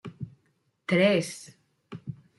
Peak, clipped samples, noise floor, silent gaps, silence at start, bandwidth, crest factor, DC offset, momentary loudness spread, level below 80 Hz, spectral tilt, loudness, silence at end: -10 dBFS; under 0.1%; -71 dBFS; none; 0.05 s; 12 kHz; 20 dB; under 0.1%; 21 LU; -70 dBFS; -5.5 dB/octave; -25 LUFS; 0.25 s